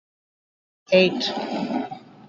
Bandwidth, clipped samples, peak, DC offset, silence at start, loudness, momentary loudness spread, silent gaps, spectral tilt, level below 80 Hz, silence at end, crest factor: 7.6 kHz; under 0.1%; -4 dBFS; under 0.1%; 0.9 s; -22 LUFS; 11 LU; none; -5.5 dB/octave; -68 dBFS; 0.3 s; 22 dB